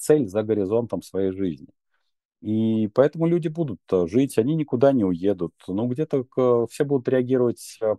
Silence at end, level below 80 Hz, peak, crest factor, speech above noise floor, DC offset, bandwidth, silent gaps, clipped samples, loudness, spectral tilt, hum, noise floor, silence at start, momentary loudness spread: 0 s; -62 dBFS; -4 dBFS; 18 dB; 54 dB; under 0.1%; 12.5 kHz; 2.25-2.29 s; under 0.1%; -23 LUFS; -7.5 dB/octave; none; -76 dBFS; 0 s; 9 LU